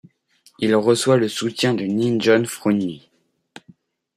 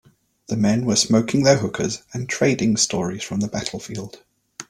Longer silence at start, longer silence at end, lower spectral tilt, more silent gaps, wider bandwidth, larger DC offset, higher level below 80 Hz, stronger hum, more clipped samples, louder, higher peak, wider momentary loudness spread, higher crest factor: about the same, 0.6 s vs 0.5 s; first, 1.2 s vs 0.1 s; about the same, -5 dB/octave vs -4.5 dB/octave; neither; about the same, 15 kHz vs 14.5 kHz; neither; second, -64 dBFS vs -54 dBFS; neither; neither; about the same, -19 LUFS vs -20 LUFS; about the same, -4 dBFS vs -2 dBFS; second, 7 LU vs 14 LU; about the same, 18 dB vs 18 dB